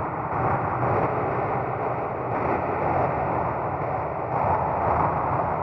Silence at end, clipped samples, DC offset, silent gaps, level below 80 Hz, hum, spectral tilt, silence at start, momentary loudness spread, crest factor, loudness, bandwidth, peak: 0 s; under 0.1%; under 0.1%; none; -48 dBFS; none; -10.5 dB/octave; 0 s; 4 LU; 16 dB; -25 LUFS; 6 kHz; -10 dBFS